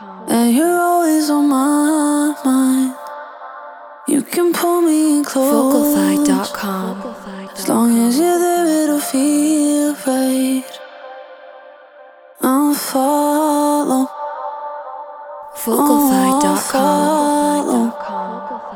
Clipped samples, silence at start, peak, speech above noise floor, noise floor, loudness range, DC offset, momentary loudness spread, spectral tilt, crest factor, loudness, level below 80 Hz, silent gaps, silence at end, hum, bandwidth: under 0.1%; 0 s; -2 dBFS; 28 dB; -42 dBFS; 3 LU; under 0.1%; 17 LU; -4 dB/octave; 14 dB; -15 LUFS; -60 dBFS; none; 0 s; none; 18.5 kHz